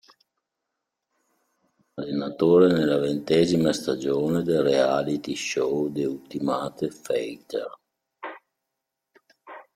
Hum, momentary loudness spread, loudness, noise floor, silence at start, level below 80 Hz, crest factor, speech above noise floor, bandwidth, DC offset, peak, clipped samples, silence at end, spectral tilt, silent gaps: none; 16 LU; -24 LUFS; -83 dBFS; 1.95 s; -64 dBFS; 20 dB; 60 dB; 15 kHz; under 0.1%; -6 dBFS; under 0.1%; 0.15 s; -6 dB/octave; none